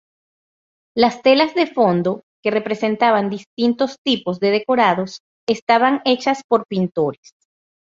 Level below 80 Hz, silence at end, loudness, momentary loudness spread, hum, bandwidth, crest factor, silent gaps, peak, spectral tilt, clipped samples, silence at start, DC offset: -62 dBFS; 0.8 s; -18 LUFS; 9 LU; none; 7.8 kHz; 18 dB; 2.23-2.43 s, 3.46-3.57 s, 3.98-4.05 s, 5.20-5.47 s, 5.62-5.67 s, 6.44-6.49 s; -2 dBFS; -5.5 dB/octave; under 0.1%; 0.95 s; under 0.1%